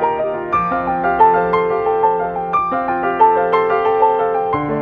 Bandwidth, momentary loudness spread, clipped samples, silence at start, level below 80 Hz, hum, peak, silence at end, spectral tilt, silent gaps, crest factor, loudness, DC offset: 4.9 kHz; 6 LU; under 0.1%; 0 s; -46 dBFS; none; 0 dBFS; 0 s; -8.5 dB/octave; none; 14 dB; -16 LUFS; under 0.1%